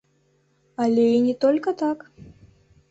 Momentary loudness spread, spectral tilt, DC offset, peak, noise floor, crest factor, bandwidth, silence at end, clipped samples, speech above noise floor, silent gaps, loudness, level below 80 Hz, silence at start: 12 LU; -7 dB/octave; under 0.1%; -8 dBFS; -65 dBFS; 14 dB; 8 kHz; 0.7 s; under 0.1%; 44 dB; none; -21 LUFS; -62 dBFS; 0.8 s